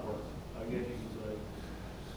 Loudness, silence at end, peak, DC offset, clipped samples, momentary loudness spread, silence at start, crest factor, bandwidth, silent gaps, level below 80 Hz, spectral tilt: -42 LUFS; 0 s; -24 dBFS; under 0.1%; under 0.1%; 7 LU; 0 s; 16 dB; over 20 kHz; none; -50 dBFS; -6.5 dB/octave